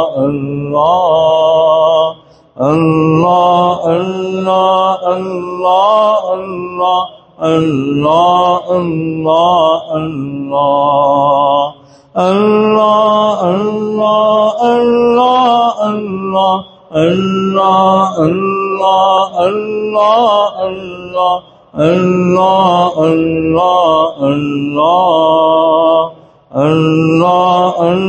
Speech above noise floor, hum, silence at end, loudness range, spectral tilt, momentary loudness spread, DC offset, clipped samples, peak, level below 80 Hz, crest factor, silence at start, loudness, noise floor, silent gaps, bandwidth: 20 dB; none; 0 s; 2 LU; -7 dB/octave; 8 LU; under 0.1%; under 0.1%; 0 dBFS; -48 dBFS; 10 dB; 0 s; -11 LUFS; -31 dBFS; none; 8.6 kHz